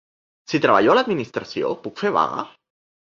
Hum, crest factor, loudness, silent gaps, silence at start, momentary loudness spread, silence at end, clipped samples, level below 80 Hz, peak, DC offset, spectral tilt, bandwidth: none; 20 dB; -20 LUFS; none; 0.5 s; 12 LU; 0.7 s; under 0.1%; -62 dBFS; -2 dBFS; under 0.1%; -5.5 dB/octave; 7.4 kHz